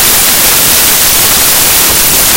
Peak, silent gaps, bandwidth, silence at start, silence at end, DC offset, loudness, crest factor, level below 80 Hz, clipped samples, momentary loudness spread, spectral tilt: 0 dBFS; none; over 20 kHz; 0 s; 0 s; under 0.1%; -3 LUFS; 6 dB; -28 dBFS; 4%; 0 LU; 0 dB/octave